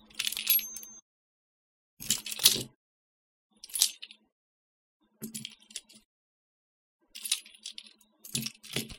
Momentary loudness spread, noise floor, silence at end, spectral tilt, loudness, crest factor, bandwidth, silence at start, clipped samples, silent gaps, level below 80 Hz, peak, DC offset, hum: 23 LU; -55 dBFS; 0 s; 0 dB/octave; -29 LUFS; 36 dB; 17 kHz; 0.15 s; under 0.1%; 1.02-1.97 s, 2.75-3.50 s, 4.32-5.00 s, 6.05-6.99 s; -66 dBFS; 0 dBFS; under 0.1%; none